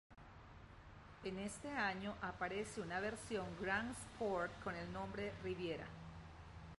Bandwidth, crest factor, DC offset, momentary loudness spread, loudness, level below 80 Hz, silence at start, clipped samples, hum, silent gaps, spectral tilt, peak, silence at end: 11.5 kHz; 20 dB; under 0.1%; 19 LU; -45 LUFS; -64 dBFS; 0.1 s; under 0.1%; none; none; -5 dB/octave; -26 dBFS; 0.05 s